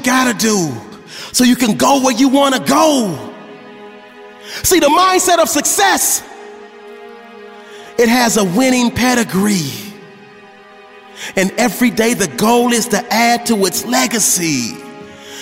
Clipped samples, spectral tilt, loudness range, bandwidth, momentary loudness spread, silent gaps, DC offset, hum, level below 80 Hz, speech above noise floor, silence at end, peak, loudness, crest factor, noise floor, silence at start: under 0.1%; -3 dB/octave; 3 LU; 16.5 kHz; 21 LU; none; under 0.1%; none; -48 dBFS; 26 dB; 0 s; 0 dBFS; -13 LUFS; 14 dB; -39 dBFS; 0 s